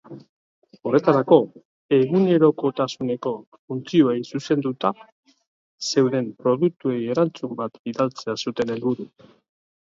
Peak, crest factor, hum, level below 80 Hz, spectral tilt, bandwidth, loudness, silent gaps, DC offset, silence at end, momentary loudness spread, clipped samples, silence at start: -2 dBFS; 20 dB; none; -68 dBFS; -6.5 dB/octave; 7.8 kHz; -22 LUFS; 0.29-0.62 s, 1.65-1.89 s, 3.47-3.52 s, 3.59-3.68 s, 5.12-5.23 s, 5.47-5.78 s, 7.79-7.85 s; under 0.1%; 0.9 s; 13 LU; under 0.1%; 0.1 s